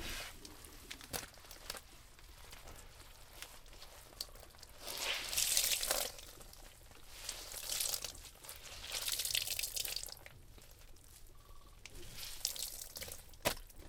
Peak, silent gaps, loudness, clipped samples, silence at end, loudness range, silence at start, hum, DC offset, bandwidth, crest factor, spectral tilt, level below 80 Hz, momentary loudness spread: -14 dBFS; none; -39 LUFS; under 0.1%; 0 s; 13 LU; 0 s; none; under 0.1%; 18 kHz; 30 dB; 0 dB/octave; -58 dBFS; 24 LU